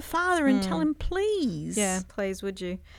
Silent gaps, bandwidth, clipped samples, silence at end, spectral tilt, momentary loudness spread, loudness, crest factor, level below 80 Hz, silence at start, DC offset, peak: none; 17 kHz; under 0.1%; 0 s; -4.5 dB/octave; 9 LU; -27 LUFS; 16 dB; -42 dBFS; 0 s; under 0.1%; -12 dBFS